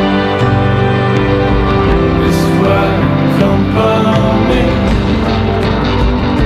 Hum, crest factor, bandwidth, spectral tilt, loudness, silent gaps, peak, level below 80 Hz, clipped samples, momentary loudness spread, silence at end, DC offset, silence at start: none; 10 dB; 14.5 kHz; -7.5 dB/octave; -11 LUFS; none; 0 dBFS; -20 dBFS; under 0.1%; 2 LU; 0 s; under 0.1%; 0 s